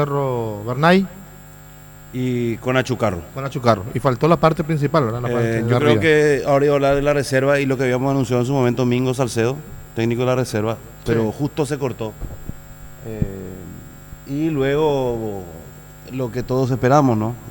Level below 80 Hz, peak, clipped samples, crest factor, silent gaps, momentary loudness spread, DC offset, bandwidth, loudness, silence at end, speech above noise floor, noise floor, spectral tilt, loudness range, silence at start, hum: -42 dBFS; 0 dBFS; under 0.1%; 18 dB; none; 18 LU; under 0.1%; 20 kHz; -19 LUFS; 0 s; 22 dB; -41 dBFS; -6.5 dB/octave; 8 LU; 0 s; 50 Hz at -45 dBFS